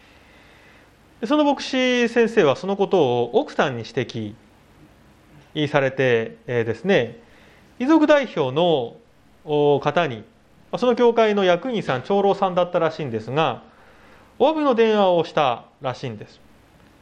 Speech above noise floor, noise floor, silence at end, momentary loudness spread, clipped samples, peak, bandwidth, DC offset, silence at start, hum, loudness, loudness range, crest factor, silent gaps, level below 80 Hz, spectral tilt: 32 dB; -52 dBFS; 0.75 s; 12 LU; under 0.1%; -2 dBFS; 9.2 kHz; under 0.1%; 1.2 s; none; -20 LUFS; 4 LU; 20 dB; none; -60 dBFS; -6 dB/octave